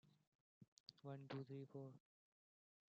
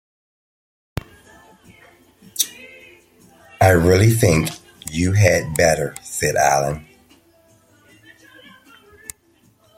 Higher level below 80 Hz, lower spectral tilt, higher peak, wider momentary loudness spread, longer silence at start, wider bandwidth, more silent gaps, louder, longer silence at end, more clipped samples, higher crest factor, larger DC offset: second, under -90 dBFS vs -46 dBFS; first, -6.5 dB/octave vs -5 dB/octave; second, -40 dBFS vs 0 dBFS; second, 10 LU vs 23 LU; second, 0.05 s vs 2.35 s; second, 7.2 kHz vs 16.5 kHz; first, 0.27-0.61 s, 0.68-0.86 s vs none; second, -57 LUFS vs -17 LUFS; second, 0.9 s vs 3 s; neither; about the same, 18 dB vs 22 dB; neither